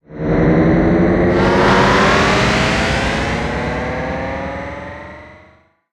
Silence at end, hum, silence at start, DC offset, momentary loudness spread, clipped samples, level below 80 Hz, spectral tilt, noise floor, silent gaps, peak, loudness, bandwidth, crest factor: 0.55 s; none; 0.1 s; under 0.1%; 15 LU; under 0.1%; -28 dBFS; -6 dB/octave; -50 dBFS; none; 0 dBFS; -14 LUFS; 12 kHz; 14 dB